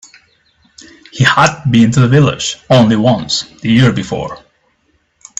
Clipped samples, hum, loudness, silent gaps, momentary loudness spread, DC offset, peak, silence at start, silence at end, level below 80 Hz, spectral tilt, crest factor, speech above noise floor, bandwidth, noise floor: under 0.1%; none; -11 LUFS; none; 11 LU; under 0.1%; 0 dBFS; 1.15 s; 1 s; -44 dBFS; -5.5 dB/octave; 12 dB; 48 dB; 8.4 kHz; -59 dBFS